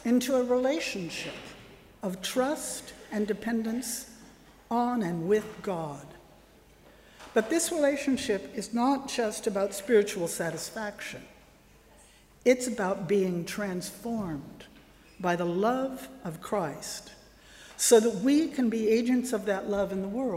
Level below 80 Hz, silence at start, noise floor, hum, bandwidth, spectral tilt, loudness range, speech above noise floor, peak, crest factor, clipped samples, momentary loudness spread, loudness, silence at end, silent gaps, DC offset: -62 dBFS; 0 s; -57 dBFS; none; 16 kHz; -4.5 dB/octave; 6 LU; 29 dB; -8 dBFS; 20 dB; under 0.1%; 14 LU; -29 LUFS; 0 s; none; under 0.1%